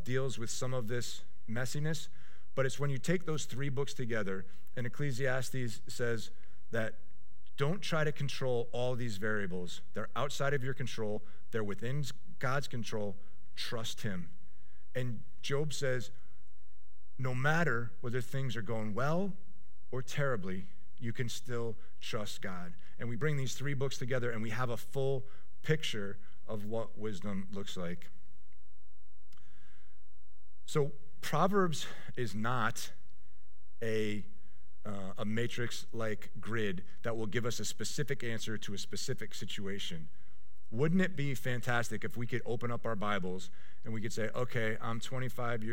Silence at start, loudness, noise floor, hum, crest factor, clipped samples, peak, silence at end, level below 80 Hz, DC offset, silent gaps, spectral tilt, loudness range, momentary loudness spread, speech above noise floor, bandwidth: 0 s; -37 LUFS; -67 dBFS; none; 22 dB; under 0.1%; -16 dBFS; 0 s; -66 dBFS; 3%; none; -5 dB/octave; 5 LU; 10 LU; 30 dB; 16.5 kHz